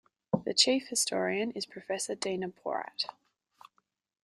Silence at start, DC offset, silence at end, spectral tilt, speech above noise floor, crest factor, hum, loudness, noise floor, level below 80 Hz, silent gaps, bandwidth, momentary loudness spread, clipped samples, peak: 0.35 s; under 0.1%; 1.1 s; -2.5 dB/octave; 45 dB; 26 dB; none; -31 LUFS; -76 dBFS; -76 dBFS; none; 15 kHz; 11 LU; under 0.1%; -8 dBFS